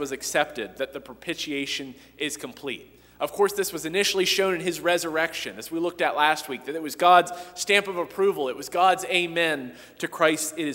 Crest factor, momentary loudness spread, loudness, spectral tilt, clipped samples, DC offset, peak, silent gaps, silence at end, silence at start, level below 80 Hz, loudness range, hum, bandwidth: 22 dB; 12 LU; -25 LUFS; -2.5 dB/octave; under 0.1%; under 0.1%; -4 dBFS; none; 0 s; 0 s; -64 dBFS; 7 LU; none; 16 kHz